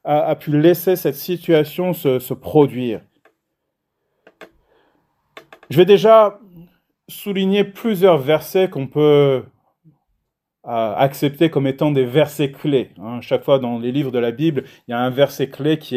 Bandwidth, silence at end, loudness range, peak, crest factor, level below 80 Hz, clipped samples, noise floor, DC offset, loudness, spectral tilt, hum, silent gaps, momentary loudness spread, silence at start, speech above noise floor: 16 kHz; 0 s; 6 LU; 0 dBFS; 18 dB; -64 dBFS; under 0.1%; -75 dBFS; under 0.1%; -17 LUFS; -7 dB/octave; none; none; 11 LU; 0.05 s; 59 dB